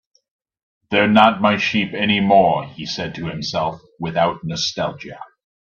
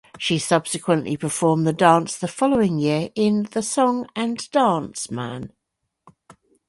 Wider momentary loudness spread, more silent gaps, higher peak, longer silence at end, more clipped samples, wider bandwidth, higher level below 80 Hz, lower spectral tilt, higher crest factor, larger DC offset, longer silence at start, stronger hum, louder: first, 14 LU vs 11 LU; neither; about the same, 0 dBFS vs -2 dBFS; second, 0.4 s vs 1.2 s; neither; second, 7.2 kHz vs 11.5 kHz; about the same, -54 dBFS vs -58 dBFS; about the same, -5 dB/octave vs -5 dB/octave; about the same, 18 dB vs 20 dB; neither; first, 0.9 s vs 0.15 s; neither; first, -18 LUFS vs -21 LUFS